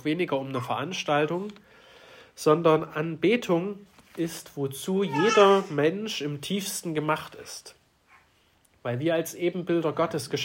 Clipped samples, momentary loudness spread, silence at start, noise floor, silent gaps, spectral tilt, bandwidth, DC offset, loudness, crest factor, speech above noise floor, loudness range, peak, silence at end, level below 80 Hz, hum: under 0.1%; 14 LU; 0.05 s; -64 dBFS; none; -5 dB/octave; 16.5 kHz; under 0.1%; -26 LUFS; 20 dB; 38 dB; 7 LU; -6 dBFS; 0 s; -70 dBFS; none